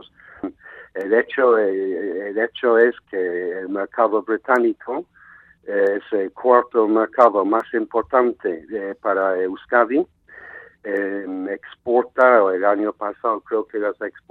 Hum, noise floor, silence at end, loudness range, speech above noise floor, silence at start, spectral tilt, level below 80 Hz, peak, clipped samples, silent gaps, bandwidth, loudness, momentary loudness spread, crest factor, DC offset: none; -49 dBFS; 0.15 s; 4 LU; 29 dB; 0.45 s; -7 dB/octave; -66 dBFS; 0 dBFS; under 0.1%; none; 4.3 kHz; -20 LUFS; 14 LU; 20 dB; under 0.1%